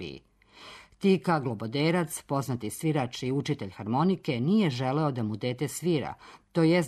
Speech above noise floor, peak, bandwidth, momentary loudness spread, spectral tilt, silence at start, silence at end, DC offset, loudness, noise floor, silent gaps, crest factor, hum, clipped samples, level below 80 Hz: 23 dB; -12 dBFS; 13.5 kHz; 13 LU; -6 dB/octave; 0 s; 0 s; under 0.1%; -28 LUFS; -51 dBFS; none; 16 dB; none; under 0.1%; -64 dBFS